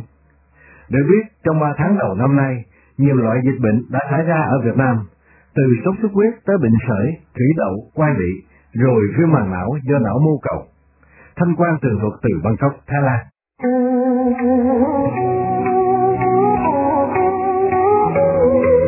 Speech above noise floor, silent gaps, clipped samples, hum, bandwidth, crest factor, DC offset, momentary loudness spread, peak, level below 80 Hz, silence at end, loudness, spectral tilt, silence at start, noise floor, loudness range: 38 dB; none; under 0.1%; none; 2.9 kHz; 16 dB; under 0.1%; 7 LU; 0 dBFS; -42 dBFS; 0 s; -17 LUFS; -14.5 dB/octave; 0 s; -54 dBFS; 3 LU